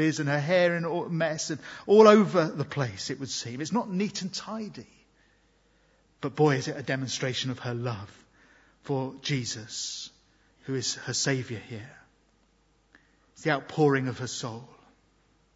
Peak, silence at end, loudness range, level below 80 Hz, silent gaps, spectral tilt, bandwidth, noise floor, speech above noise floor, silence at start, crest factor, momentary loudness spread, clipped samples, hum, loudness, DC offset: -4 dBFS; 0.9 s; 10 LU; -68 dBFS; none; -5 dB/octave; 8 kHz; -66 dBFS; 39 dB; 0 s; 26 dB; 15 LU; under 0.1%; none; -27 LUFS; under 0.1%